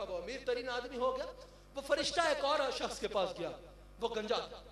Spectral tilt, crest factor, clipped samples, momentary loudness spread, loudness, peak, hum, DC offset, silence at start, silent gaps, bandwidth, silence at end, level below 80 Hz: -2.5 dB/octave; 20 dB; under 0.1%; 14 LU; -36 LUFS; -18 dBFS; 50 Hz at -70 dBFS; under 0.1%; 0 s; none; 13 kHz; 0 s; -60 dBFS